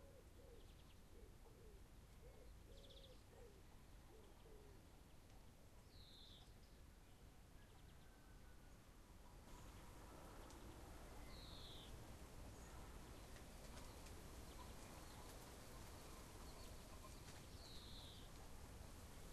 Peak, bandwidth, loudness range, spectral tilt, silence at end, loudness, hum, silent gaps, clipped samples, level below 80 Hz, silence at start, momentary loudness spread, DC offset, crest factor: -44 dBFS; 13 kHz; 7 LU; -4 dB/octave; 0 s; -62 LUFS; none; none; under 0.1%; -64 dBFS; 0 s; 8 LU; under 0.1%; 16 dB